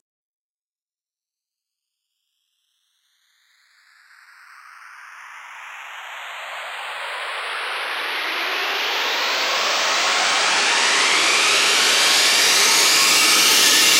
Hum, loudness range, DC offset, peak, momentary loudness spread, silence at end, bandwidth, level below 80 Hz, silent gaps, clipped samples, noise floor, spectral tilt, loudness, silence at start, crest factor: none; 21 LU; under 0.1%; -2 dBFS; 20 LU; 0 s; 16 kHz; -78 dBFS; none; under 0.1%; under -90 dBFS; 2 dB/octave; -15 LUFS; 4.8 s; 18 dB